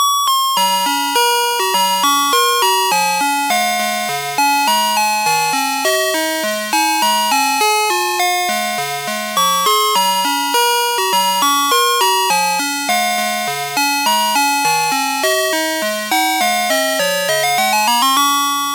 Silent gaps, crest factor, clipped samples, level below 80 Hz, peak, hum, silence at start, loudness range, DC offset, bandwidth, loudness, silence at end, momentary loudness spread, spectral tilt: none; 14 dB; under 0.1%; -78 dBFS; 0 dBFS; none; 0 s; 2 LU; under 0.1%; 17 kHz; -14 LUFS; 0 s; 4 LU; -0.5 dB/octave